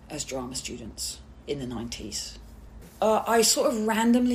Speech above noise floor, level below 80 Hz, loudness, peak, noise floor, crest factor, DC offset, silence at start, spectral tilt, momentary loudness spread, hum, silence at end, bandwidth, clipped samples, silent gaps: 20 dB; -50 dBFS; -26 LUFS; -8 dBFS; -46 dBFS; 18 dB; under 0.1%; 0 s; -3 dB/octave; 15 LU; none; 0 s; 15.5 kHz; under 0.1%; none